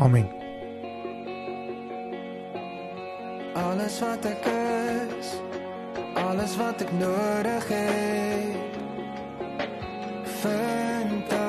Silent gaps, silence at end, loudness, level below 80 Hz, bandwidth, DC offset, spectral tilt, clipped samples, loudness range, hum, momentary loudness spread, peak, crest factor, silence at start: none; 0 s; -29 LUFS; -58 dBFS; 13 kHz; under 0.1%; -6 dB/octave; under 0.1%; 6 LU; none; 11 LU; -8 dBFS; 20 dB; 0 s